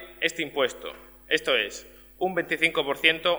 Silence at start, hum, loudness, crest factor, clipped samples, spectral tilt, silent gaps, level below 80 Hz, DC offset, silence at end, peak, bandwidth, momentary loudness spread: 0 s; none; -25 LUFS; 24 dB; under 0.1%; -2.5 dB/octave; none; -58 dBFS; under 0.1%; 0 s; -2 dBFS; over 20 kHz; 17 LU